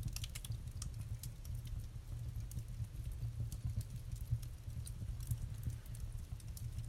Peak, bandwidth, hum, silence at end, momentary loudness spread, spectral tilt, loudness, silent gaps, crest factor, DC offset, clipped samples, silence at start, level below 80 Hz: -26 dBFS; 16.5 kHz; none; 0 s; 5 LU; -5 dB/octave; -46 LUFS; none; 18 dB; under 0.1%; under 0.1%; 0 s; -48 dBFS